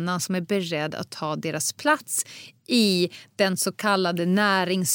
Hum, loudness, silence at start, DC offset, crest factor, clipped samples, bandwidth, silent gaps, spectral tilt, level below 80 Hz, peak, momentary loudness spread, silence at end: none; -24 LUFS; 0 s; under 0.1%; 18 dB; under 0.1%; 17 kHz; none; -3.5 dB/octave; -78 dBFS; -8 dBFS; 9 LU; 0 s